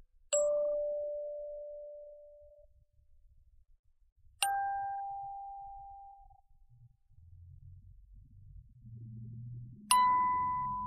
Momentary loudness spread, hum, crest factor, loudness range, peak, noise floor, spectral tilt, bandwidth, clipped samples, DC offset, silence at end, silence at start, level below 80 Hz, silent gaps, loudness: 25 LU; none; 26 dB; 20 LU; -12 dBFS; -64 dBFS; -2 dB/octave; 6 kHz; under 0.1%; under 0.1%; 0 s; 0 s; -62 dBFS; 3.79-3.84 s, 4.12-4.16 s; -33 LUFS